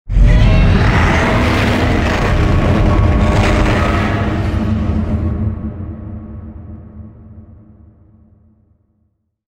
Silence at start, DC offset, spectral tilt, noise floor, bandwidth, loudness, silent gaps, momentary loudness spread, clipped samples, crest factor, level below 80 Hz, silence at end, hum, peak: 0.05 s; under 0.1%; -7 dB/octave; -63 dBFS; 10 kHz; -14 LUFS; none; 20 LU; under 0.1%; 14 dB; -18 dBFS; 2.15 s; none; 0 dBFS